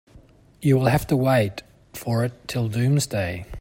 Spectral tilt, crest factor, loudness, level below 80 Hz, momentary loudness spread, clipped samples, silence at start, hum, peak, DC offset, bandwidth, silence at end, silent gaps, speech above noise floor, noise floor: -6.5 dB/octave; 16 dB; -23 LUFS; -48 dBFS; 11 LU; under 0.1%; 0.15 s; none; -6 dBFS; under 0.1%; 16.5 kHz; 0 s; none; 29 dB; -51 dBFS